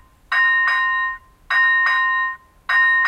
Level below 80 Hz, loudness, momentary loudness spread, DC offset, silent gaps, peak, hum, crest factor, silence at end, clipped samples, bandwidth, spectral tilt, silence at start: -56 dBFS; -17 LUFS; 11 LU; under 0.1%; none; -6 dBFS; none; 12 dB; 0 s; under 0.1%; 12 kHz; 0 dB/octave; 0.3 s